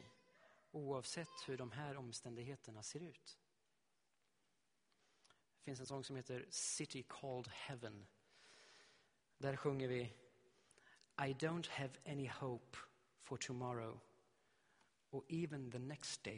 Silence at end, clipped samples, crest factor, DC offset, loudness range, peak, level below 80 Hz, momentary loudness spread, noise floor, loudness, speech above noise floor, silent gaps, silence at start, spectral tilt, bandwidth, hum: 0 s; under 0.1%; 22 dB; under 0.1%; 9 LU; -26 dBFS; -80 dBFS; 20 LU; -87 dBFS; -48 LUFS; 39 dB; none; 0 s; -4.5 dB/octave; 10.5 kHz; none